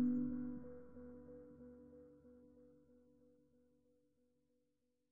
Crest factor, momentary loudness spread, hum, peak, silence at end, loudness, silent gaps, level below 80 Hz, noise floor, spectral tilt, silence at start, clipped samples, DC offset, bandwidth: 20 dB; 24 LU; none; -30 dBFS; 0 s; -47 LUFS; none; -74 dBFS; -86 dBFS; -9.5 dB/octave; 0 s; under 0.1%; under 0.1%; 2 kHz